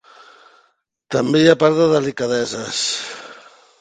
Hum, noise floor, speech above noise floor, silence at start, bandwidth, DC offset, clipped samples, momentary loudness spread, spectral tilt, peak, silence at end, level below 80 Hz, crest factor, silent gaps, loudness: none; -63 dBFS; 46 dB; 1.1 s; 9.4 kHz; under 0.1%; under 0.1%; 16 LU; -4.5 dB/octave; 0 dBFS; 0.45 s; -60 dBFS; 18 dB; none; -17 LUFS